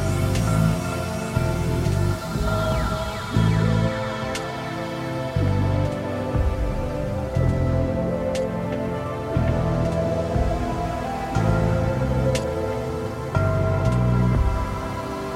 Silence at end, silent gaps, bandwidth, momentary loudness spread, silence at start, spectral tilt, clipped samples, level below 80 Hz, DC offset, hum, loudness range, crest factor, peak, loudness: 0 s; none; 16 kHz; 7 LU; 0 s; -7 dB/octave; under 0.1%; -30 dBFS; under 0.1%; none; 2 LU; 16 dB; -6 dBFS; -24 LUFS